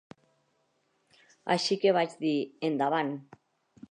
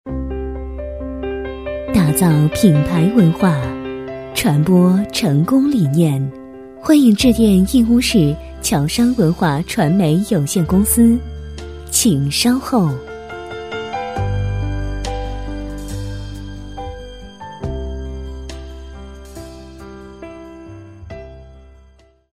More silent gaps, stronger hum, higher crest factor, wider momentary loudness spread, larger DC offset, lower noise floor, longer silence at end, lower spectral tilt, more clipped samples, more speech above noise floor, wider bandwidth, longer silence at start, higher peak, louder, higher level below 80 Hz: neither; neither; about the same, 18 dB vs 16 dB; second, 10 LU vs 22 LU; second, under 0.1% vs 0.2%; first, -73 dBFS vs -49 dBFS; about the same, 0.7 s vs 0.75 s; about the same, -5 dB/octave vs -5.5 dB/octave; neither; first, 45 dB vs 36 dB; second, 10 kHz vs 16 kHz; first, 1.45 s vs 0.05 s; second, -12 dBFS vs 0 dBFS; second, -29 LUFS vs -16 LUFS; second, -82 dBFS vs -32 dBFS